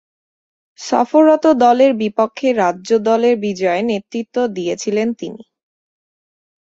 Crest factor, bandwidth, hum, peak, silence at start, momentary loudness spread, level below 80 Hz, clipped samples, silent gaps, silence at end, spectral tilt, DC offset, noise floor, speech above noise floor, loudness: 16 dB; 8 kHz; none; -2 dBFS; 0.8 s; 11 LU; -62 dBFS; under 0.1%; none; 1.25 s; -5 dB/octave; under 0.1%; under -90 dBFS; over 75 dB; -15 LUFS